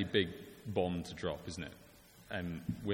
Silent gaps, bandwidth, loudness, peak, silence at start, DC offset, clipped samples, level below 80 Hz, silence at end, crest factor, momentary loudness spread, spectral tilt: none; 17 kHz; -40 LUFS; -16 dBFS; 0 s; under 0.1%; under 0.1%; -60 dBFS; 0 s; 22 dB; 18 LU; -5.5 dB/octave